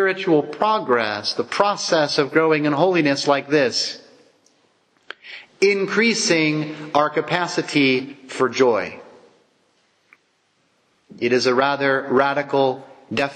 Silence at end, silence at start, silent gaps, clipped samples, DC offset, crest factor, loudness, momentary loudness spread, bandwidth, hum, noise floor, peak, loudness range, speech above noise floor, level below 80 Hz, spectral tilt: 0 s; 0 s; none; under 0.1%; under 0.1%; 18 dB; -19 LUFS; 9 LU; 9.8 kHz; none; -65 dBFS; -2 dBFS; 5 LU; 46 dB; -70 dBFS; -4 dB/octave